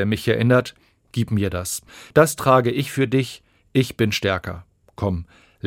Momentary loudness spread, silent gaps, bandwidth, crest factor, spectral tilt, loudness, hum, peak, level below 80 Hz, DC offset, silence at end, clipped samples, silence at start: 14 LU; none; 16.5 kHz; 20 dB; -5.5 dB/octave; -21 LUFS; none; -2 dBFS; -50 dBFS; under 0.1%; 0 s; under 0.1%; 0 s